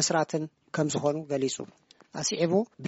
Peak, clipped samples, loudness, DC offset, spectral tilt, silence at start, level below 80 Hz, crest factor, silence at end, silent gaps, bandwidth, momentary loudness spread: -12 dBFS; under 0.1%; -29 LUFS; under 0.1%; -4.5 dB/octave; 0 s; -70 dBFS; 18 dB; 0 s; none; 8 kHz; 11 LU